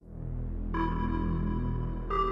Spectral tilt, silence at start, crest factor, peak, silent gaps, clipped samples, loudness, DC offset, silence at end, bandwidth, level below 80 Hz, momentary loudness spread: -9.5 dB/octave; 0.05 s; 14 dB; -16 dBFS; none; under 0.1%; -33 LUFS; under 0.1%; 0 s; 5.4 kHz; -34 dBFS; 7 LU